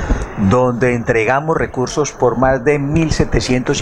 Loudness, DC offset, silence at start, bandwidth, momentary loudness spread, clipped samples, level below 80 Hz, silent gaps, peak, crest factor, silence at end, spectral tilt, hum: -15 LUFS; under 0.1%; 0 s; 11 kHz; 4 LU; under 0.1%; -26 dBFS; none; 0 dBFS; 14 dB; 0 s; -5.5 dB/octave; none